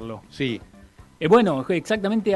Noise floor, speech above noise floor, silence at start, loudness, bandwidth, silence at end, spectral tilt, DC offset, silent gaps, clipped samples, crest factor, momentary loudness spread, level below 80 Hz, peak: -49 dBFS; 28 dB; 0 s; -22 LUFS; 12 kHz; 0 s; -6.5 dB/octave; under 0.1%; none; under 0.1%; 16 dB; 14 LU; -54 dBFS; -6 dBFS